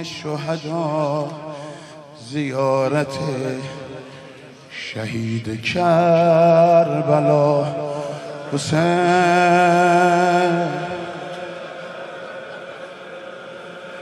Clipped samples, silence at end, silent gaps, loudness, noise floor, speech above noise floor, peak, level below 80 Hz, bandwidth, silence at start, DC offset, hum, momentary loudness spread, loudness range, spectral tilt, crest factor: under 0.1%; 0 s; none; -18 LUFS; -41 dBFS; 23 dB; -2 dBFS; -62 dBFS; 12 kHz; 0 s; under 0.1%; none; 21 LU; 8 LU; -6 dB/octave; 16 dB